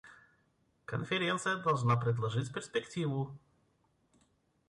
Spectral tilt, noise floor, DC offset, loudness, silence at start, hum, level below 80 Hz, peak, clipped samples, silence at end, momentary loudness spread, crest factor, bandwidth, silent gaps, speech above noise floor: -5.5 dB/octave; -74 dBFS; under 0.1%; -34 LUFS; 0.05 s; none; -68 dBFS; -18 dBFS; under 0.1%; 1.3 s; 10 LU; 18 dB; 11 kHz; none; 40 dB